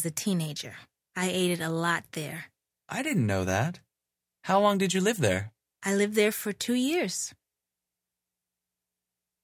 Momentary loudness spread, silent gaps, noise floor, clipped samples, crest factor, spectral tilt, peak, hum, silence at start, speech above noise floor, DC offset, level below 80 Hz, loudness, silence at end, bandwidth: 14 LU; none; -88 dBFS; under 0.1%; 20 dB; -4.5 dB/octave; -10 dBFS; 60 Hz at -50 dBFS; 0 s; 60 dB; under 0.1%; -56 dBFS; -28 LUFS; 2.1 s; 16 kHz